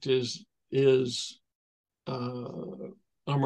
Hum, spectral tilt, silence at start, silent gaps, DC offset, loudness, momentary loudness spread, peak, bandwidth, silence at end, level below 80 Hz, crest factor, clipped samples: none; -5.5 dB/octave; 0 s; 1.55-1.84 s; under 0.1%; -30 LUFS; 19 LU; -12 dBFS; 10.5 kHz; 0 s; -74 dBFS; 20 dB; under 0.1%